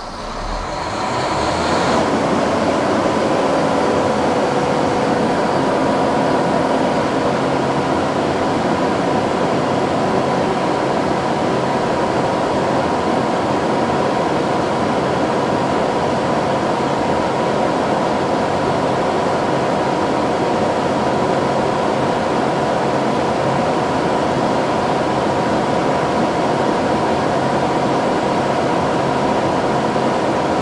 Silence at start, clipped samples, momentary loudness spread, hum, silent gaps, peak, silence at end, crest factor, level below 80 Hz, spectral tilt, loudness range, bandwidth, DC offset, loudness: 0 s; under 0.1%; 1 LU; none; none; -4 dBFS; 0 s; 14 dB; -42 dBFS; -5.5 dB/octave; 1 LU; 11.5 kHz; under 0.1%; -17 LUFS